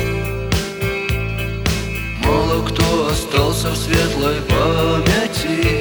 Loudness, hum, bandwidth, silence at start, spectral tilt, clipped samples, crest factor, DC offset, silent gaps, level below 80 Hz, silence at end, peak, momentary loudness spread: -18 LUFS; none; over 20 kHz; 0 s; -5 dB/octave; under 0.1%; 16 dB; under 0.1%; none; -26 dBFS; 0 s; 0 dBFS; 5 LU